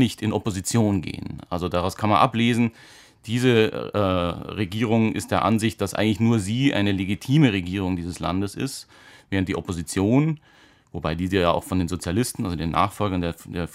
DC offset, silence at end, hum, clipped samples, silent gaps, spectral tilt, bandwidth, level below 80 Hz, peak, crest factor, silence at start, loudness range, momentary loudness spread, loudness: under 0.1%; 0 s; none; under 0.1%; none; -6 dB/octave; 16 kHz; -48 dBFS; -4 dBFS; 20 dB; 0 s; 3 LU; 10 LU; -23 LUFS